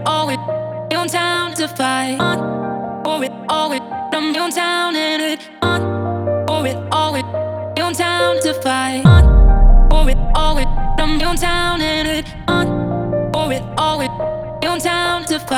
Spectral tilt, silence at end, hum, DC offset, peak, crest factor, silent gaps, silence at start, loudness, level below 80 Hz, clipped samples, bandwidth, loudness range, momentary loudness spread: -5 dB/octave; 0 s; none; under 0.1%; 0 dBFS; 14 dB; none; 0 s; -17 LUFS; -18 dBFS; under 0.1%; 15 kHz; 5 LU; 8 LU